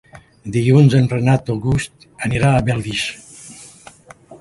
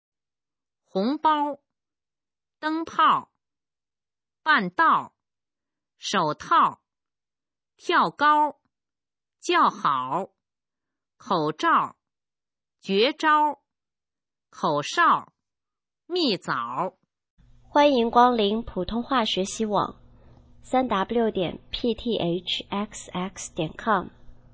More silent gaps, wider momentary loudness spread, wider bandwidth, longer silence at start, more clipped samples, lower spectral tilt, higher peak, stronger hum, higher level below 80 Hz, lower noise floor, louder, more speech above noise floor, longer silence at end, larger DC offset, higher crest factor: second, none vs 17.30-17.37 s; first, 24 LU vs 12 LU; first, 11.5 kHz vs 8 kHz; second, 0.15 s vs 0.95 s; neither; first, -6.5 dB/octave vs -4 dB/octave; about the same, -2 dBFS vs -4 dBFS; neither; first, -40 dBFS vs -56 dBFS; second, -43 dBFS vs under -90 dBFS; first, -17 LUFS vs -24 LUFS; second, 27 dB vs over 67 dB; second, 0.05 s vs 0.2 s; neither; second, 16 dB vs 22 dB